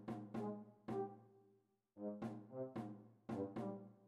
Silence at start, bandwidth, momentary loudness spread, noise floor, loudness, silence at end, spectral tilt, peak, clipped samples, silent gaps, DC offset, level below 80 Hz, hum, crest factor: 0 s; 12 kHz; 7 LU; -77 dBFS; -49 LUFS; 0 s; -9 dB/octave; -32 dBFS; under 0.1%; none; under 0.1%; -82 dBFS; none; 16 dB